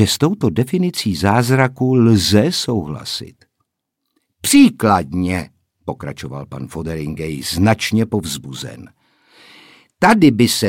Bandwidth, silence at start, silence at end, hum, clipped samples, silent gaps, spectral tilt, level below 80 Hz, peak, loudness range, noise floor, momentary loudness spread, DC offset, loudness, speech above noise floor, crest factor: 17 kHz; 0 s; 0 s; none; under 0.1%; none; -5 dB/octave; -46 dBFS; 0 dBFS; 5 LU; -75 dBFS; 18 LU; under 0.1%; -16 LUFS; 60 dB; 16 dB